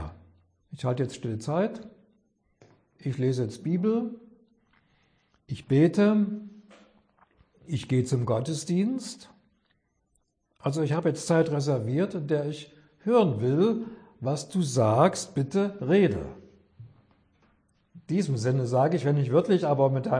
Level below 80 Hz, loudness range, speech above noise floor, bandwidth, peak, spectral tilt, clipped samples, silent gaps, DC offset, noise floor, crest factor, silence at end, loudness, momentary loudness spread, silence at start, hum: -60 dBFS; 6 LU; 48 dB; 10.5 kHz; -8 dBFS; -7 dB/octave; under 0.1%; none; under 0.1%; -73 dBFS; 20 dB; 0 s; -26 LUFS; 13 LU; 0 s; none